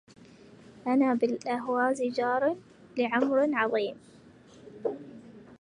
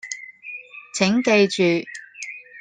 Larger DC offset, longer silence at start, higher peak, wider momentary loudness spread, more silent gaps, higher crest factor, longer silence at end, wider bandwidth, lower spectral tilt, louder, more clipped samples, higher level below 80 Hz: neither; first, 0.75 s vs 0.05 s; second, -12 dBFS vs -2 dBFS; second, 15 LU vs 18 LU; neither; about the same, 18 dB vs 20 dB; about the same, 0.05 s vs 0 s; about the same, 10.5 kHz vs 9.6 kHz; about the same, -5.5 dB/octave vs -4.5 dB/octave; second, -28 LUFS vs -19 LUFS; neither; second, -74 dBFS vs -64 dBFS